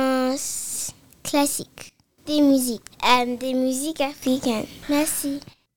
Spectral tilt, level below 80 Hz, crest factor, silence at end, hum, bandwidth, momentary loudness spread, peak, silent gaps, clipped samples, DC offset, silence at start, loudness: -2.5 dB/octave; -56 dBFS; 22 dB; 0 s; none; over 20 kHz; 13 LU; -2 dBFS; none; under 0.1%; 0.5%; 0 s; -23 LUFS